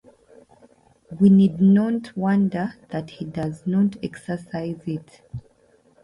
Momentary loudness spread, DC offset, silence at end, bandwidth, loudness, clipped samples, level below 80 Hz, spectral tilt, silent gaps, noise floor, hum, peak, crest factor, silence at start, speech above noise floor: 20 LU; under 0.1%; 0.65 s; 10.5 kHz; -22 LUFS; under 0.1%; -56 dBFS; -9 dB/octave; none; -59 dBFS; none; -6 dBFS; 16 dB; 1.1 s; 38 dB